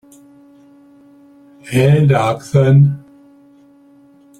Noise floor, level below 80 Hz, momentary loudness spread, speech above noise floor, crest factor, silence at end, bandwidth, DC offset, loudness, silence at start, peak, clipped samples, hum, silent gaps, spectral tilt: -47 dBFS; -50 dBFS; 7 LU; 35 dB; 16 dB; 1.4 s; 12 kHz; under 0.1%; -13 LUFS; 1.65 s; 0 dBFS; under 0.1%; none; none; -8 dB/octave